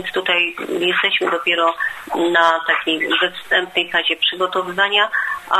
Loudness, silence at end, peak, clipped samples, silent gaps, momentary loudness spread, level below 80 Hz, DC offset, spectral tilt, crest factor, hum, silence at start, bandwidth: -17 LUFS; 0 s; 0 dBFS; under 0.1%; none; 6 LU; -62 dBFS; under 0.1%; -3 dB/octave; 18 dB; none; 0 s; 13 kHz